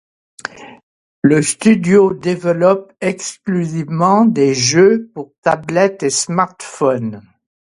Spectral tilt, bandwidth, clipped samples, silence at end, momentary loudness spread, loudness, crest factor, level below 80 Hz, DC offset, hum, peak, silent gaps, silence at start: -5 dB/octave; 11.5 kHz; under 0.1%; 0.45 s; 12 LU; -15 LUFS; 16 dB; -56 dBFS; under 0.1%; none; 0 dBFS; 0.83-1.22 s, 5.38-5.43 s; 0.45 s